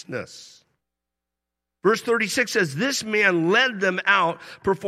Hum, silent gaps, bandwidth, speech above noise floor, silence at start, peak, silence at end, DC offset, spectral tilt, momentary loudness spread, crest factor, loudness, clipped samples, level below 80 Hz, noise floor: none; none; 15 kHz; 62 dB; 0.1 s; -4 dBFS; 0 s; under 0.1%; -3.5 dB/octave; 9 LU; 20 dB; -21 LUFS; under 0.1%; -64 dBFS; -85 dBFS